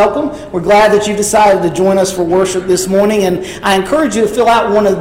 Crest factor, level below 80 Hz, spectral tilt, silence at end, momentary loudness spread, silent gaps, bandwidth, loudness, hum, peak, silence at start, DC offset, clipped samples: 10 dB; -38 dBFS; -4.5 dB/octave; 0 s; 6 LU; none; 16.5 kHz; -11 LUFS; none; 0 dBFS; 0 s; under 0.1%; under 0.1%